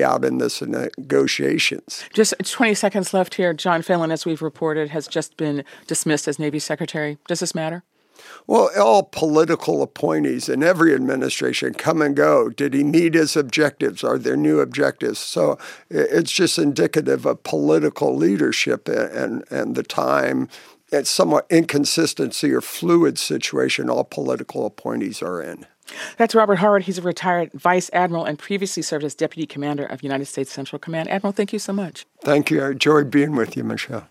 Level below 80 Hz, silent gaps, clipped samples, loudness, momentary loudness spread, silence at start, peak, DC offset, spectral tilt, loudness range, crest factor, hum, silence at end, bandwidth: -72 dBFS; none; under 0.1%; -20 LUFS; 10 LU; 0 s; -2 dBFS; under 0.1%; -4.5 dB/octave; 5 LU; 18 dB; none; 0.05 s; 16 kHz